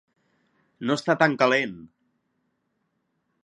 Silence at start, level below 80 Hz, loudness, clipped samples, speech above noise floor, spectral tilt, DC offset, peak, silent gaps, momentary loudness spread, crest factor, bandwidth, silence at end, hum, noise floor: 0.8 s; -72 dBFS; -23 LUFS; under 0.1%; 52 dB; -5 dB/octave; under 0.1%; -2 dBFS; none; 13 LU; 24 dB; 11.5 kHz; 1.6 s; none; -75 dBFS